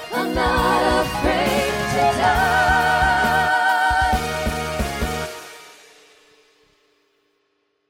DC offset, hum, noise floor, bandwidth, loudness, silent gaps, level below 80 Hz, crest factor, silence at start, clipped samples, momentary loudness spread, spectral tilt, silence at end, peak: under 0.1%; none; -69 dBFS; 17 kHz; -19 LUFS; none; -34 dBFS; 16 dB; 0 s; under 0.1%; 8 LU; -4 dB/octave; 2.2 s; -4 dBFS